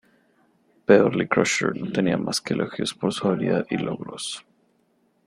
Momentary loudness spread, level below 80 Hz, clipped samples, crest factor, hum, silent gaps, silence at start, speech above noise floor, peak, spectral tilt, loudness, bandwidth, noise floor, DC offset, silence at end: 14 LU; -62 dBFS; under 0.1%; 22 dB; none; none; 0.9 s; 43 dB; -2 dBFS; -5 dB/octave; -23 LUFS; 13 kHz; -66 dBFS; under 0.1%; 0.85 s